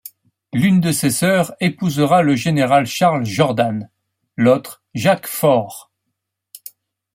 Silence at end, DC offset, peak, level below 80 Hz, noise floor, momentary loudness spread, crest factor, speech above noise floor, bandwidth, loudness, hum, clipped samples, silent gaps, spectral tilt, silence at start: 1.35 s; under 0.1%; -2 dBFS; -58 dBFS; -77 dBFS; 16 LU; 16 dB; 61 dB; 16.5 kHz; -16 LUFS; none; under 0.1%; none; -5.5 dB/octave; 0.05 s